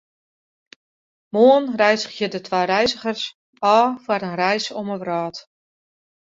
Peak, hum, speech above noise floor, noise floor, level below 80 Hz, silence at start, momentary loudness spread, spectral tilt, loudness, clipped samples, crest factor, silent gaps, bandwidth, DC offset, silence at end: -2 dBFS; none; over 71 dB; under -90 dBFS; -64 dBFS; 1.35 s; 12 LU; -4.5 dB/octave; -20 LUFS; under 0.1%; 18 dB; 3.34-3.53 s; 7.8 kHz; under 0.1%; 0.8 s